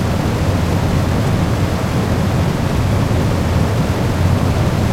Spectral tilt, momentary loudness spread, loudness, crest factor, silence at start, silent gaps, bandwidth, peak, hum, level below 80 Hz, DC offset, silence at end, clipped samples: -6.5 dB/octave; 2 LU; -16 LUFS; 12 dB; 0 s; none; 16 kHz; -4 dBFS; none; -26 dBFS; under 0.1%; 0 s; under 0.1%